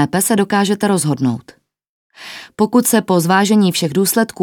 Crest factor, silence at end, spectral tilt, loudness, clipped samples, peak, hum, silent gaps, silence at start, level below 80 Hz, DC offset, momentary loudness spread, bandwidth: 16 dB; 0 s; -4.5 dB/octave; -14 LUFS; under 0.1%; 0 dBFS; none; 1.89-2.10 s; 0 s; -60 dBFS; under 0.1%; 12 LU; 19 kHz